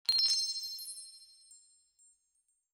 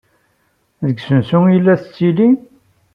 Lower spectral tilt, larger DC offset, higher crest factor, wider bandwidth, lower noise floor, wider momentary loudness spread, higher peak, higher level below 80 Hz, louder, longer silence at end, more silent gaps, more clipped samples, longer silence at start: second, 5 dB/octave vs -10 dB/octave; neither; first, 22 dB vs 14 dB; first, over 20 kHz vs 5.4 kHz; first, -78 dBFS vs -62 dBFS; first, 20 LU vs 10 LU; second, -16 dBFS vs -2 dBFS; second, -88 dBFS vs -58 dBFS; second, -31 LUFS vs -14 LUFS; first, 1.15 s vs 0.55 s; neither; neither; second, 0.1 s vs 0.8 s